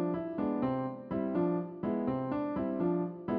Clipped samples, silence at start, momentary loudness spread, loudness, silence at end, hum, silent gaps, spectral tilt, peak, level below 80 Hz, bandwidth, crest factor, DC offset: under 0.1%; 0 s; 4 LU; -34 LUFS; 0 s; none; none; -9 dB/octave; -20 dBFS; -62 dBFS; 4.8 kHz; 14 dB; under 0.1%